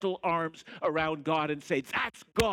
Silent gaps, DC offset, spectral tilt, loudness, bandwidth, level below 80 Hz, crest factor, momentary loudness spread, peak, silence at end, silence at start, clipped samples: none; under 0.1%; -5 dB/octave; -31 LUFS; 17.5 kHz; -54 dBFS; 22 dB; 3 LU; -10 dBFS; 0 s; 0 s; under 0.1%